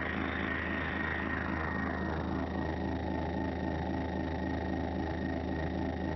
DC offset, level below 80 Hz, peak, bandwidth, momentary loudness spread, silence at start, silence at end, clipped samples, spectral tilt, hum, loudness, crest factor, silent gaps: under 0.1%; -44 dBFS; -22 dBFS; 6 kHz; 2 LU; 0 s; 0 s; under 0.1%; -5.5 dB/octave; none; -35 LUFS; 14 dB; none